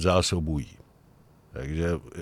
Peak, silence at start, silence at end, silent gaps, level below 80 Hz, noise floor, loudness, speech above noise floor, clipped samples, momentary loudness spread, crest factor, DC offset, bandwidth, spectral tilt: -8 dBFS; 0 s; 0 s; none; -40 dBFS; -57 dBFS; -28 LUFS; 30 dB; under 0.1%; 18 LU; 20 dB; under 0.1%; 14 kHz; -5 dB/octave